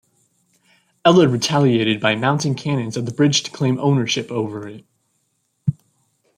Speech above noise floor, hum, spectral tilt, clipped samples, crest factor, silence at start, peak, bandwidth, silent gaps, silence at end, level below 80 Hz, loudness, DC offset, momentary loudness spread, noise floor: 51 dB; none; -5 dB/octave; under 0.1%; 18 dB; 1.05 s; -2 dBFS; 11.5 kHz; none; 0.65 s; -60 dBFS; -18 LUFS; under 0.1%; 11 LU; -69 dBFS